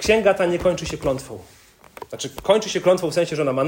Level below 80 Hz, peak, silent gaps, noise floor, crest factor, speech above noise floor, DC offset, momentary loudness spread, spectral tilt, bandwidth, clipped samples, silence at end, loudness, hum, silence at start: -46 dBFS; -4 dBFS; none; -42 dBFS; 16 dB; 22 dB; under 0.1%; 19 LU; -4.5 dB/octave; 16.5 kHz; under 0.1%; 0 s; -21 LUFS; none; 0 s